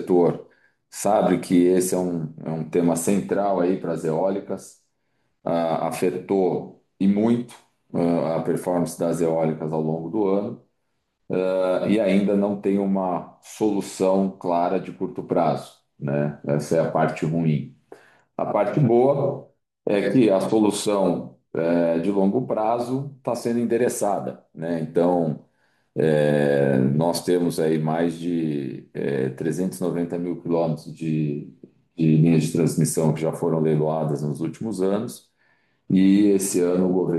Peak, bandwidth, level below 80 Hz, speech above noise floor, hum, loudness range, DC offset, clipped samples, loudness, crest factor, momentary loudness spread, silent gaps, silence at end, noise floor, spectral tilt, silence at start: -6 dBFS; 12.5 kHz; -66 dBFS; 53 dB; none; 3 LU; under 0.1%; under 0.1%; -22 LUFS; 16 dB; 11 LU; none; 0 s; -75 dBFS; -6.5 dB/octave; 0 s